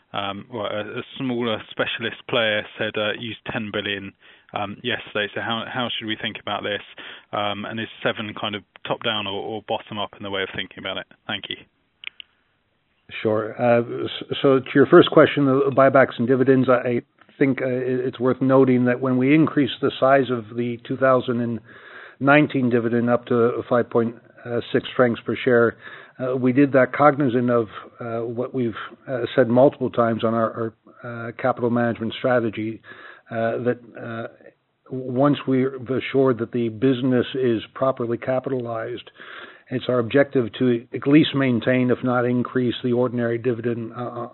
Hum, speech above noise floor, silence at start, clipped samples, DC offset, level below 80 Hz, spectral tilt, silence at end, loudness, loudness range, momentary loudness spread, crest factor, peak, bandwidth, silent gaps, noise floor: none; 46 dB; 0.15 s; under 0.1%; under 0.1%; -66 dBFS; -4.5 dB/octave; 0.05 s; -21 LUFS; 9 LU; 15 LU; 22 dB; 0 dBFS; 4.2 kHz; none; -68 dBFS